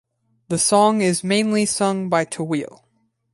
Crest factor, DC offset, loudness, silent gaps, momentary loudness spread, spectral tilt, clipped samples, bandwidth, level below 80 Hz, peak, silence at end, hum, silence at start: 18 dB; under 0.1%; -19 LUFS; none; 11 LU; -4 dB/octave; under 0.1%; 11.5 kHz; -62 dBFS; -4 dBFS; 0.65 s; none; 0.5 s